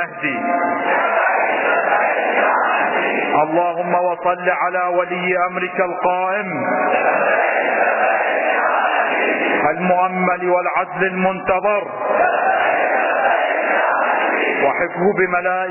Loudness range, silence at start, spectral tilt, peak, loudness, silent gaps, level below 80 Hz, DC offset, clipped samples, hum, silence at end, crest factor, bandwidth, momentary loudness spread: 2 LU; 0 s; -8.5 dB/octave; -4 dBFS; -17 LUFS; none; -60 dBFS; under 0.1%; under 0.1%; none; 0 s; 14 dB; 3.1 kHz; 3 LU